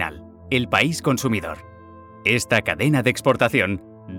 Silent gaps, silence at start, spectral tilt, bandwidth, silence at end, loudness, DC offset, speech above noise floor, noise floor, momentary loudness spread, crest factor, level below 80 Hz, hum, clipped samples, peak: none; 0 s; -5 dB/octave; 17.5 kHz; 0 s; -20 LUFS; under 0.1%; 23 dB; -43 dBFS; 10 LU; 18 dB; -50 dBFS; none; under 0.1%; -4 dBFS